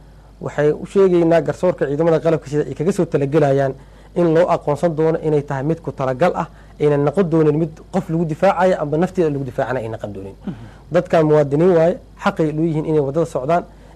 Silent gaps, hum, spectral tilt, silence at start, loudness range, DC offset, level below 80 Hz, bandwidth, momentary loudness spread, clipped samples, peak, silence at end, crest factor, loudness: none; none; -8 dB/octave; 0.4 s; 2 LU; under 0.1%; -44 dBFS; 12 kHz; 11 LU; under 0.1%; -6 dBFS; 0.3 s; 12 dB; -18 LUFS